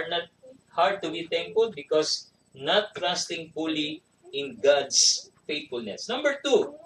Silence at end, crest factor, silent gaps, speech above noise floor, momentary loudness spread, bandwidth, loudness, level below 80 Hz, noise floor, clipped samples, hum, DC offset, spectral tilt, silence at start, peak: 0.1 s; 20 dB; none; 27 dB; 13 LU; 12 kHz; -26 LUFS; -74 dBFS; -53 dBFS; under 0.1%; none; under 0.1%; -1.5 dB/octave; 0 s; -8 dBFS